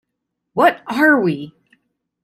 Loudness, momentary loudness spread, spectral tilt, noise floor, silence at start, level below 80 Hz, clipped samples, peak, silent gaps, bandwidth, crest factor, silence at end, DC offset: -16 LUFS; 14 LU; -6.5 dB/octave; -77 dBFS; 0.55 s; -64 dBFS; under 0.1%; -2 dBFS; none; 15.5 kHz; 16 dB; 0.75 s; under 0.1%